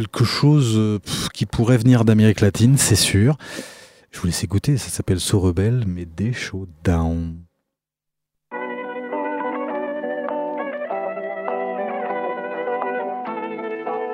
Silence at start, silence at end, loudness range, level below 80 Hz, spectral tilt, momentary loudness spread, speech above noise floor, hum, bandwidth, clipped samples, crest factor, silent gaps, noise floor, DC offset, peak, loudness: 0 s; 0 s; 10 LU; -42 dBFS; -5.5 dB/octave; 13 LU; 64 dB; none; 16 kHz; under 0.1%; 18 dB; none; -82 dBFS; under 0.1%; -2 dBFS; -21 LUFS